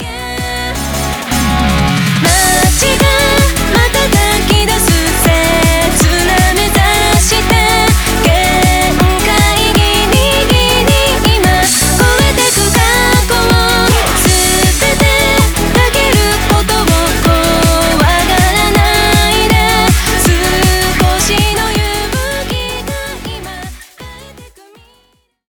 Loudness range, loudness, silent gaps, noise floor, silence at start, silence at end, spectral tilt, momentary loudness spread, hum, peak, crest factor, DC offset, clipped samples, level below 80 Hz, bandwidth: 3 LU; -9 LUFS; none; -54 dBFS; 0 s; 1 s; -3.5 dB/octave; 8 LU; none; 0 dBFS; 10 dB; under 0.1%; under 0.1%; -18 dBFS; over 20 kHz